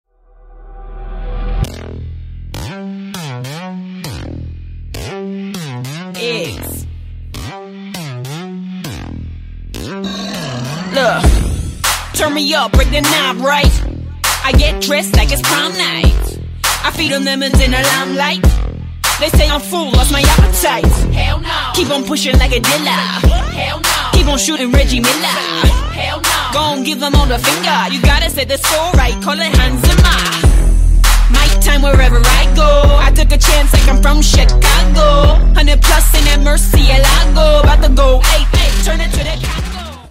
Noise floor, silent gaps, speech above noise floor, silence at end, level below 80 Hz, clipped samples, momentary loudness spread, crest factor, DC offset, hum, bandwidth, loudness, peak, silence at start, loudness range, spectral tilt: -42 dBFS; none; 32 dB; 0 s; -14 dBFS; under 0.1%; 16 LU; 12 dB; under 0.1%; none; 16.5 kHz; -12 LUFS; 0 dBFS; 0.5 s; 15 LU; -4 dB/octave